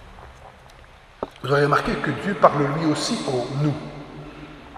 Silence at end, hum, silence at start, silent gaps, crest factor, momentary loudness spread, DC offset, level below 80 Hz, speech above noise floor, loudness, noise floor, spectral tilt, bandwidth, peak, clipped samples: 0 s; none; 0 s; none; 24 dB; 20 LU; under 0.1%; -48 dBFS; 26 dB; -22 LUFS; -47 dBFS; -5.5 dB/octave; 13 kHz; 0 dBFS; under 0.1%